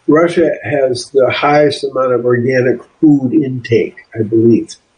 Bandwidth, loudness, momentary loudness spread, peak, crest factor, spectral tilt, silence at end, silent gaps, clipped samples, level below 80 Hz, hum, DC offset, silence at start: 10 kHz; -13 LUFS; 5 LU; 0 dBFS; 12 dB; -6.5 dB/octave; 0.25 s; none; under 0.1%; -54 dBFS; none; under 0.1%; 0.1 s